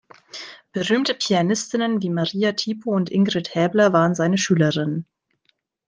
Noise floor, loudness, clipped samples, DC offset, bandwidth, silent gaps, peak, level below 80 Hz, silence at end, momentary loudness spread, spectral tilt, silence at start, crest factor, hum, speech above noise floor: -68 dBFS; -21 LUFS; under 0.1%; under 0.1%; 10 kHz; none; -4 dBFS; -64 dBFS; 0.85 s; 13 LU; -5 dB/octave; 0.35 s; 18 dB; none; 48 dB